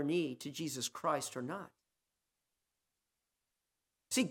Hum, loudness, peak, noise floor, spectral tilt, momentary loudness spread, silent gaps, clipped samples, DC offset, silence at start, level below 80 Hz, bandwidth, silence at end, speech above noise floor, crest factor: none; -39 LUFS; -20 dBFS; -88 dBFS; -3.5 dB/octave; 9 LU; none; under 0.1%; under 0.1%; 0 s; -86 dBFS; 17.5 kHz; 0 s; 50 dB; 20 dB